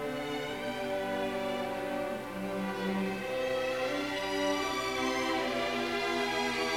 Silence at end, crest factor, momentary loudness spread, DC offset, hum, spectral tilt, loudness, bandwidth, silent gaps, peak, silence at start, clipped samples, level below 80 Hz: 0 s; 14 dB; 5 LU; under 0.1%; none; -4 dB/octave; -33 LUFS; 17 kHz; none; -20 dBFS; 0 s; under 0.1%; -60 dBFS